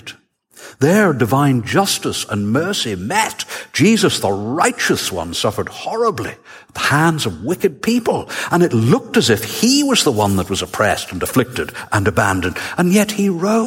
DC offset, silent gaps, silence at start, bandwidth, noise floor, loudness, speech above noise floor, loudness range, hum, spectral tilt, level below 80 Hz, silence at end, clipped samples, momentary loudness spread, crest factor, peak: under 0.1%; none; 0.05 s; 17 kHz; -47 dBFS; -16 LUFS; 31 dB; 3 LU; none; -4.5 dB/octave; -48 dBFS; 0 s; under 0.1%; 7 LU; 16 dB; 0 dBFS